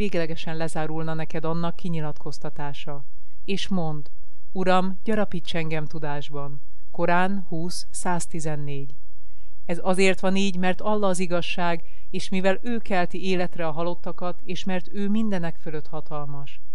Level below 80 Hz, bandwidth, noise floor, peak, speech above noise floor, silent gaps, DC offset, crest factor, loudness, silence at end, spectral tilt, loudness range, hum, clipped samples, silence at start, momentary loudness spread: -50 dBFS; 12.5 kHz; -52 dBFS; -6 dBFS; 25 dB; none; 10%; 18 dB; -28 LUFS; 0.2 s; -5.5 dB/octave; 5 LU; none; under 0.1%; 0 s; 13 LU